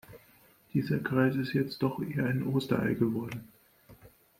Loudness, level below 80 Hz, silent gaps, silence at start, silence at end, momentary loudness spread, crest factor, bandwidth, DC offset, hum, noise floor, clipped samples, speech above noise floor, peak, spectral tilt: -31 LUFS; -64 dBFS; none; 0.1 s; 0.3 s; 7 LU; 20 dB; 16.5 kHz; under 0.1%; none; -61 dBFS; under 0.1%; 32 dB; -12 dBFS; -8 dB/octave